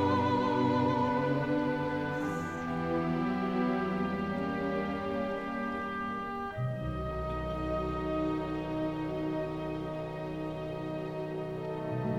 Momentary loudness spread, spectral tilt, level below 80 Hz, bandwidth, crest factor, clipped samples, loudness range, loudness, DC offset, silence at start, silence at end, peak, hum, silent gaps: 9 LU; -8 dB/octave; -50 dBFS; 13.5 kHz; 16 dB; under 0.1%; 5 LU; -33 LUFS; under 0.1%; 0 s; 0 s; -16 dBFS; none; none